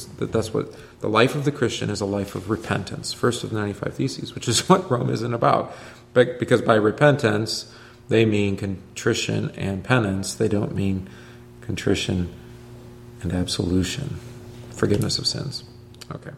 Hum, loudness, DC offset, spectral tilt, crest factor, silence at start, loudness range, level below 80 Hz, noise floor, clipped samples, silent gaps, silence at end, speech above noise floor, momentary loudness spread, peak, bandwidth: none; -23 LUFS; under 0.1%; -5 dB/octave; 22 dB; 0 s; 6 LU; -50 dBFS; -42 dBFS; under 0.1%; none; 0 s; 19 dB; 19 LU; -2 dBFS; 15.5 kHz